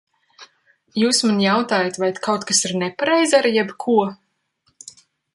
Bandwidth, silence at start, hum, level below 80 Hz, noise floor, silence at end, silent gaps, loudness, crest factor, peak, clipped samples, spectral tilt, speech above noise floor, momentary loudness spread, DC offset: 11.5 kHz; 0.4 s; none; -66 dBFS; -67 dBFS; 1.2 s; none; -18 LUFS; 18 dB; -2 dBFS; under 0.1%; -3 dB/octave; 48 dB; 7 LU; under 0.1%